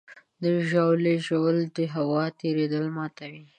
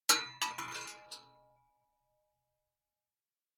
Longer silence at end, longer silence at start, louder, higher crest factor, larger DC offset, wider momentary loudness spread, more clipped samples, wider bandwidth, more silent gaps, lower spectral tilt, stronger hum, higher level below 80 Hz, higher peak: second, 0.15 s vs 2.35 s; about the same, 0.1 s vs 0.1 s; first, -26 LUFS vs -35 LUFS; second, 16 dB vs 30 dB; neither; second, 9 LU vs 21 LU; neither; second, 9.4 kHz vs 18 kHz; neither; first, -7.5 dB/octave vs 1 dB/octave; neither; first, -76 dBFS vs -84 dBFS; about the same, -10 dBFS vs -12 dBFS